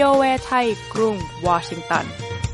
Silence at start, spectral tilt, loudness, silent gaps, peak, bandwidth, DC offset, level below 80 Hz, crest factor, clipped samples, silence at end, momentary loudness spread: 0 s; -5 dB/octave; -21 LUFS; none; -4 dBFS; 11.5 kHz; under 0.1%; -42 dBFS; 18 dB; under 0.1%; 0 s; 7 LU